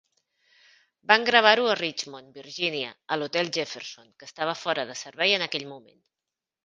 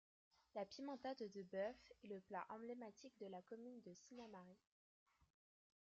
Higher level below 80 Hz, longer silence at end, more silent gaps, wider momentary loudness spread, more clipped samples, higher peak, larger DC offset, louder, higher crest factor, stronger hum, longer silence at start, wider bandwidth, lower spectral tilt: first, -76 dBFS vs -90 dBFS; second, 0.85 s vs 1.35 s; neither; first, 22 LU vs 12 LU; neither; first, 0 dBFS vs -36 dBFS; neither; first, -24 LUFS vs -54 LUFS; first, 26 dB vs 20 dB; neither; first, 1.1 s vs 0.55 s; first, 9.6 kHz vs 7.6 kHz; second, -2.5 dB/octave vs -4 dB/octave